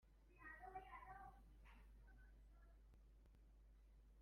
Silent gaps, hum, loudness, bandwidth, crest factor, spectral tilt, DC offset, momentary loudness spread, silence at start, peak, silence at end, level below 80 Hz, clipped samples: none; none; -62 LUFS; 11.5 kHz; 20 dB; -6 dB/octave; under 0.1%; 11 LU; 0 s; -44 dBFS; 0 s; -68 dBFS; under 0.1%